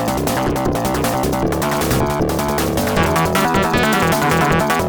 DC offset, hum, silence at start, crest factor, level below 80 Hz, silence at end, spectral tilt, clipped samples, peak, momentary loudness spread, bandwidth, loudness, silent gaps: under 0.1%; none; 0 s; 14 dB; -32 dBFS; 0 s; -5 dB/octave; under 0.1%; -2 dBFS; 4 LU; over 20 kHz; -17 LUFS; none